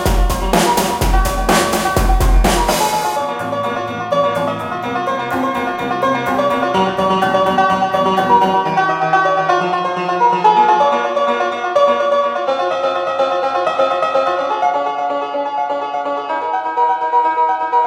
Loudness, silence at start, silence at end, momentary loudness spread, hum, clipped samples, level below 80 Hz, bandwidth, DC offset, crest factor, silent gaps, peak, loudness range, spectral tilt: -16 LUFS; 0 s; 0 s; 7 LU; none; under 0.1%; -24 dBFS; 17 kHz; under 0.1%; 14 dB; none; 0 dBFS; 4 LU; -4.5 dB/octave